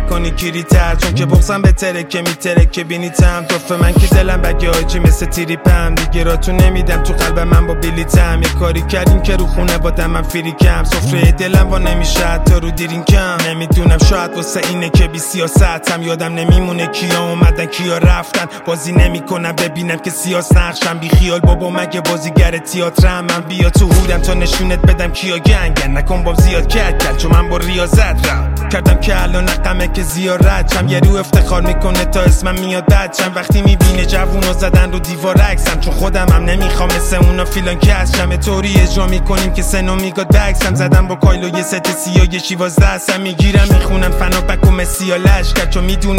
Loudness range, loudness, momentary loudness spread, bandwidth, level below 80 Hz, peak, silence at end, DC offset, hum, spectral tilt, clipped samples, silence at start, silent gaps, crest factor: 1 LU; -13 LUFS; 6 LU; 16.5 kHz; -14 dBFS; 0 dBFS; 0 s; under 0.1%; none; -5.5 dB/octave; under 0.1%; 0 s; none; 10 dB